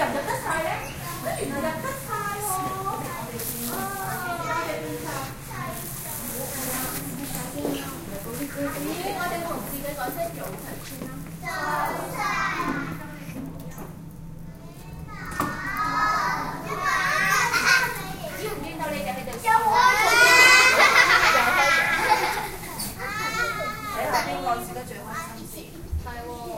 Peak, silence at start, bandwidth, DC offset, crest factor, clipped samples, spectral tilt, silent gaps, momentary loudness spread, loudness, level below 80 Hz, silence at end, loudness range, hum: -2 dBFS; 0 s; 17 kHz; under 0.1%; 22 dB; under 0.1%; -2.5 dB/octave; none; 19 LU; -23 LUFS; -44 dBFS; 0 s; 14 LU; none